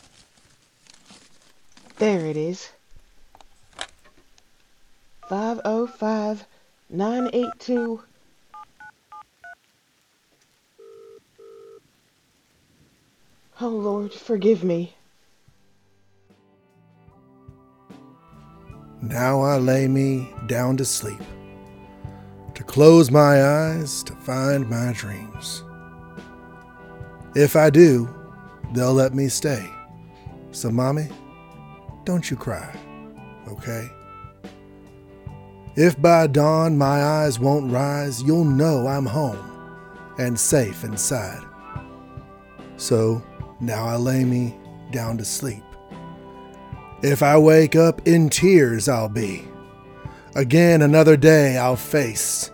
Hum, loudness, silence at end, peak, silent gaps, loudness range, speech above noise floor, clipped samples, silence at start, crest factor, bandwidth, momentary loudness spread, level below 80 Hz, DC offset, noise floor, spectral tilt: none; -19 LUFS; 0.05 s; 0 dBFS; none; 14 LU; 46 dB; under 0.1%; 2 s; 22 dB; over 20 kHz; 27 LU; -52 dBFS; under 0.1%; -64 dBFS; -6 dB/octave